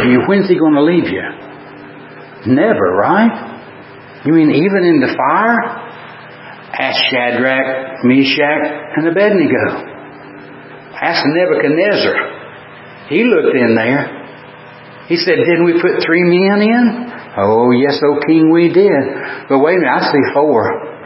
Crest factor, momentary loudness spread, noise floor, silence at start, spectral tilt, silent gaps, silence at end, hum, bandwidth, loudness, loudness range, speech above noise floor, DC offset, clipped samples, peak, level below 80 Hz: 12 dB; 22 LU; -35 dBFS; 0 s; -9.5 dB/octave; none; 0 s; none; 5.8 kHz; -12 LUFS; 4 LU; 23 dB; under 0.1%; under 0.1%; 0 dBFS; -54 dBFS